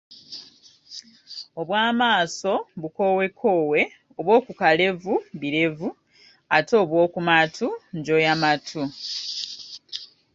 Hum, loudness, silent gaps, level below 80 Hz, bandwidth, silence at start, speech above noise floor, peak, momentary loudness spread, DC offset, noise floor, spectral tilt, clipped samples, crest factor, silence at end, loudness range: none; -22 LUFS; none; -66 dBFS; 7.8 kHz; 0.1 s; 30 dB; -2 dBFS; 18 LU; under 0.1%; -51 dBFS; -4.5 dB/octave; under 0.1%; 22 dB; 0.3 s; 2 LU